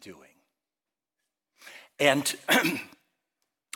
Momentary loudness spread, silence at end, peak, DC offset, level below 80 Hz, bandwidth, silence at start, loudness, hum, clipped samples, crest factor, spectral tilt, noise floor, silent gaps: 22 LU; 0.9 s; -6 dBFS; under 0.1%; -76 dBFS; 17.5 kHz; 0.05 s; -25 LUFS; none; under 0.1%; 24 dB; -2.5 dB/octave; under -90 dBFS; none